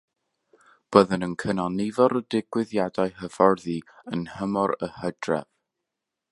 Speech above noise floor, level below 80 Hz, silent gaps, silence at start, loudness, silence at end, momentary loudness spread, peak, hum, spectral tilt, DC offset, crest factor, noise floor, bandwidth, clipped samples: 60 dB; -60 dBFS; none; 0.9 s; -25 LUFS; 0.9 s; 11 LU; -2 dBFS; none; -6.5 dB/octave; under 0.1%; 24 dB; -85 dBFS; 11.5 kHz; under 0.1%